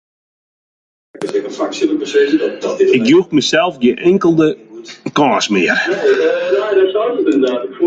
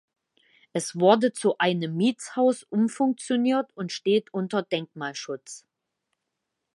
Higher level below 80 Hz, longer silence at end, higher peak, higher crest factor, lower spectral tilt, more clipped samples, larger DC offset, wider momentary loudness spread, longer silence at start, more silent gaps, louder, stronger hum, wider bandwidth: first, -58 dBFS vs -78 dBFS; second, 0 s vs 1.15 s; about the same, -2 dBFS vs -4 dBFS; second, 12 dB vs 22 dB; about the same, -5 dB/octave vs -5 dB/octave; neither; neither; second, 9 LU vs 13 LU; first, 1.15 s vs 0.75 s; neither; first, -14 LUFS vs -25 LUFS; neither; second, 9 kHz vs 11.5 kHz